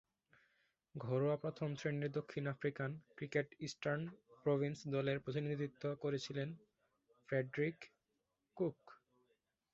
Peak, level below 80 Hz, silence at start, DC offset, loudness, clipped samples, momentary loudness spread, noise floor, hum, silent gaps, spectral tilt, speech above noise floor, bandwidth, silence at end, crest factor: -22 dBFS; -78 dBFS; 0.95 s; under 0.1%; -42 LUFS; under 0.1%; 9 LU; -87 dBFS; none; none; -6 dB/octave; 46 dB; 7.6 kHz; 0.8 s; 20 dB